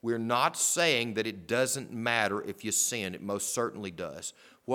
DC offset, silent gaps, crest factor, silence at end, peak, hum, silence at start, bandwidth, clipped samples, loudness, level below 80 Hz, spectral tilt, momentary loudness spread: under 0.1%; none; 22 dB; 0 s; -10 dBFS; none; 0.05 s; 19 kHz; under 0.1%; -29 LUFS; -72 dBFS; -2.5 dB/octave; 13 LU